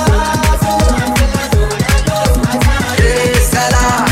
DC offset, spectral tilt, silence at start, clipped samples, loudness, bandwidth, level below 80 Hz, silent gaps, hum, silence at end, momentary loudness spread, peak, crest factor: under 0.1%; -4.5 dB/octave; 0 s; under 0.1%; -12 LUFS; 16.5 kHz; -16 dBFS; none; none; 0 s; 2 LU; 0 dBFS; 10 dB